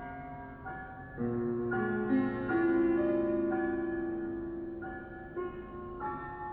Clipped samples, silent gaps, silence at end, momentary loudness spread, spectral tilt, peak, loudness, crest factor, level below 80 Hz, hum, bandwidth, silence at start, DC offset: under 0.1%; none; 0 s; 15 LU; -11 dB/octave; -18 dBFS; -34 LUFS; 14 dB; -56 dBFS; none; 4.1 kHz; 0 s; under 0.1%